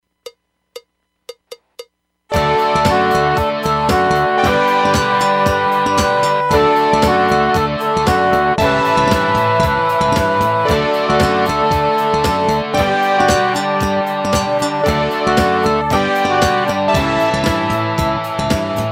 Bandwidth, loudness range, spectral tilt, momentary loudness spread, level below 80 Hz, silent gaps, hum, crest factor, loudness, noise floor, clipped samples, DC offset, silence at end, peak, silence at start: 16.5 kHz; 2 LU; -5 dB/octave; 4 LU; -34 dBFS; none; none; 14 dB; -15 LUFS; -59 dBFS; under 0.1%; under 0.1%; 0 s; 0 dBFS; 0.25 s